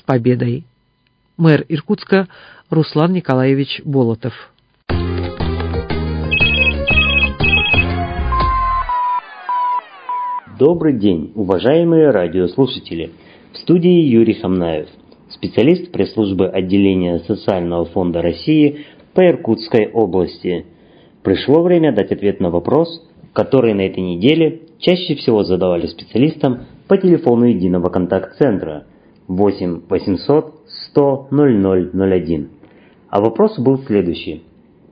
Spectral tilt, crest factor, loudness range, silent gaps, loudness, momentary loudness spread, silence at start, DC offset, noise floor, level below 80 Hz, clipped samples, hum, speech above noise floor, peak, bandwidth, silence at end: -9.5 dB/octave; 16 dB; 3 LU; none; -15 LUFS; 11 LU; 0.1 s; under 0.1%; -60 dBFS; -32 dBFS; under 0.1%; none; 46 dB; 0 dBFS; 5.2 kHz; 0.5 s